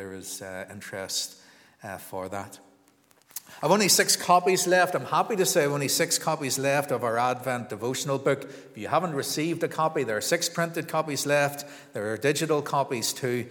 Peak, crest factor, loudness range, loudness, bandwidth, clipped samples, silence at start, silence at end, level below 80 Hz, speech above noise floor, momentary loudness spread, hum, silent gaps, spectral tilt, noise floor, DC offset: -6 dBFS; 22 dB; 6 LU; -25 LUFS; 19.5 kHz; under 0.1%; 0 s; 0 s; -78 dBFS; 35 dB; 17 LU; none; none; -3 dB/octave; -62 dBFS; under 0.1%